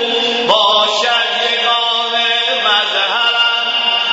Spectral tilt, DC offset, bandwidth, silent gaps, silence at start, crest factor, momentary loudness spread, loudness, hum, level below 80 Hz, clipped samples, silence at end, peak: -0.5 dB/octave; under 0.1%; 8 kHz; none; 0 s; 14 dB; 3 LU; -12 LUFS; none; -64 dBFS; under 0.1%; 0 s; 0 dBFS